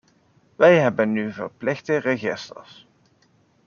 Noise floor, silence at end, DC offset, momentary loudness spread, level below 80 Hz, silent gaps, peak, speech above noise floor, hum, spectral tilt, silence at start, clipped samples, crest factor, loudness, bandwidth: -61 dBFS; 1.05 s; under 0.1%; 17 LU; -68 dBFS; none; -2 dBFS; 40 dB; none; -6.5 dB/octave; 0.6 s; under 0.1%; 20 dB; -21 LUFS; 7 kHz